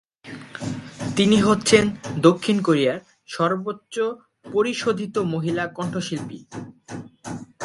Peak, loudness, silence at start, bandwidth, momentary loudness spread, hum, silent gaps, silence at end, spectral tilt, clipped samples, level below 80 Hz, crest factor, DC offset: 0 dBFS; -22 LUFS; 0.25 s; 11.5 kHz; 20 LU; none; none; 0 s; -5 dB/octave; under 0.1%; -56 dBFS; 22 dB; under 0.1%